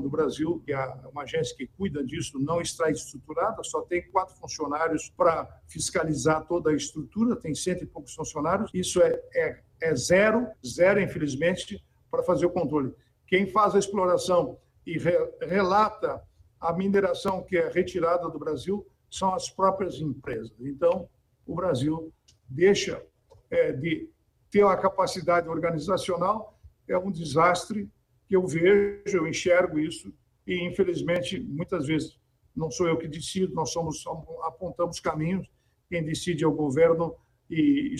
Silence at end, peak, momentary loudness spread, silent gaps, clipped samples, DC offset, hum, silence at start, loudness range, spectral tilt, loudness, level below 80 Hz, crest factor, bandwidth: 0 s; -10 dBFS; 12 LU; none; under 0.1%; under 0.1%; none; 0 s; 5 LU; -5 dB/octave; -27 LUFS; -56 dBFS; 16 dB; 12.5 kHz